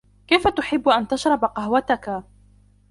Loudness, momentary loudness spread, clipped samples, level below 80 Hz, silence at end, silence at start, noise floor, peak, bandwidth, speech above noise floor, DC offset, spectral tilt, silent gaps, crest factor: -21 LUFS; 6 LU; under 0.1%; -48 dBFS; 0.7 s; 0.3 s; -54 dBFS; -4 dBFS; 11.5 kHz; 34 dB; under 0.1%; -4.5 dB/octave; none; 18 dB